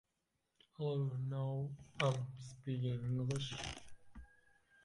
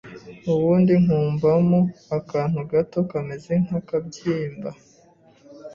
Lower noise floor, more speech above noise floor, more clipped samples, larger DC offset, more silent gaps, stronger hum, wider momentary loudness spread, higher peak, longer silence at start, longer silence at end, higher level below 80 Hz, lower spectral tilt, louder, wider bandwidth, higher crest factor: first, -86 dBFS vs -54 dBFS; first, 46 dB vs 33 dB; neither; neither; neither; neither; first, 19 LU vs 13 LU; second, -22 dBFS vs -8 dBFS; first, 0.8 s vs 0.05 s; first, 0.6 s vs 0 s; second, -66 dBFS vs -56 dBFS; second, -6 dB/octave vs -9 dB/octave; second, -41 LUFS vs -22 LUFS; first, 11.5 kHz vs 7.2 kHz; first, 20 dB vs 14 dB